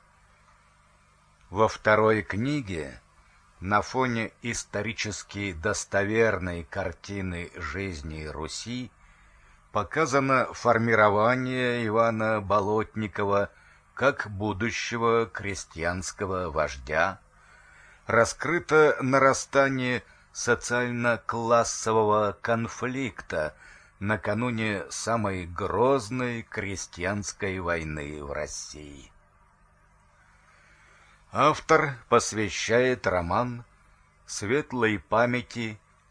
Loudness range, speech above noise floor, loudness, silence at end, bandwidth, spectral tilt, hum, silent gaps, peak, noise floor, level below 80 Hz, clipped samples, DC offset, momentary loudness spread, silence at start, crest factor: 8 LU; 34 dB; -26 LUFS; 0.35 s; 10.5 kHz; -4.5 dB/octave; 50 Hz at -60 dBFS; none; -6 dBFS; -60 dBFS; -52 dBFS; under 0.1%; under 0.1%; 13 LU; 1.5 s; 22 dB